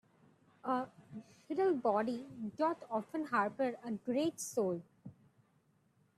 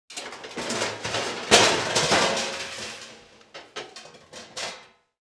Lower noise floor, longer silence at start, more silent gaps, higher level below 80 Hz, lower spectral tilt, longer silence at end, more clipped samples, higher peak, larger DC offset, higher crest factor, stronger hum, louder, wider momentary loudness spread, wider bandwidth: first, -73 dBFS vs -49 dBFS; first, 0.65 s vs 0.1 s; neither; second, -82 dBFS vs -58 dBFS; first, -5 dB/octave vs -1.5 dB/octave; first, 1.05 s vs 0.4 s; neither; second, -20 dBFS vs -2 dBFS; neither; second, 18 dB vs 26 dB; neither; second, -37 LUFS vs -23 LUFS; second, 20 LU vs 26 LU; first, 14.5 kHz vs 11 kHz